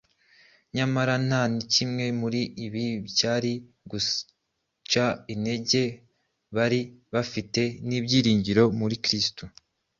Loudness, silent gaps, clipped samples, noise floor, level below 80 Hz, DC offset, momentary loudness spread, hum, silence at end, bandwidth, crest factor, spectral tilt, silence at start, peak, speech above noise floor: -26 LUFS; none; under 0.1%; -79 dBFS; -58 dBFS; under 0.1%; 9 LU; none; 0.5 s; 7.6 kHz; 20 dB; -4.5 dB/octave; 0.75 s; -8 dBFS; 53 dB